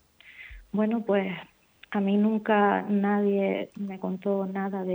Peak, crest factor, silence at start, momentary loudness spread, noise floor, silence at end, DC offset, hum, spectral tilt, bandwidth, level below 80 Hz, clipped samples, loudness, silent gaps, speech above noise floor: -10 dBFS; 18 dB; 0.25 s; 12 LU; -49 dBFS; 0 s; under 0.1%; none; -9 dB/octave; over 20 kHz; -60 dBFS; under 0.1%; -27 LUFS; none; 24 dB